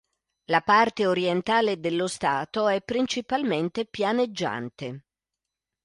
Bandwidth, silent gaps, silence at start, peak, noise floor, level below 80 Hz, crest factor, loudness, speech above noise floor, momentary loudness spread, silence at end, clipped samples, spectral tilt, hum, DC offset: 11.5 kHz; none; 0.5 s; -6 dBFS; -87 dBFS; -64 dBFS; 20 dB; -25 LUFS; 62 dB; 11 LU; 0.85 s; under 0.1%; -4.5 dB/octave; none; under 0.1%